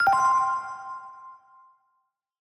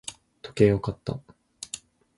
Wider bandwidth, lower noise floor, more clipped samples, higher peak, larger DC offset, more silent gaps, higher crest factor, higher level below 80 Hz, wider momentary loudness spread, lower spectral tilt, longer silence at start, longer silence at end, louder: first, 15.5 kHz vs 11.5 kHz; first, -75 dBFS vs -44 dBFS; neither; second, -12 dBFS vs -6 dBFS; neither; neither; second, 16 dB vs 22 dB; second, -66 dBFS vs -50 dBFS; first, 23 LU vs 19 LU; second, -2 dB/octave vs -6 dB/octave; about the same, 0 s vs 0.05 s; first, 1.2 s vs 0.4 s; about the same, -24 LUFS vs -26 LUFS